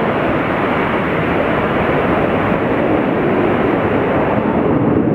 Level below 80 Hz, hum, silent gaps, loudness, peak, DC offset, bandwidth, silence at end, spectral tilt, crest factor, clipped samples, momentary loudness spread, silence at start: -36 dBFS; none; none; -15 LUFS; -2 dBFS; under 0.1%; 14 kHz; 0 s; -8.5 dB/octave; 12 dB; under 0.1%; 2 LU; 0 s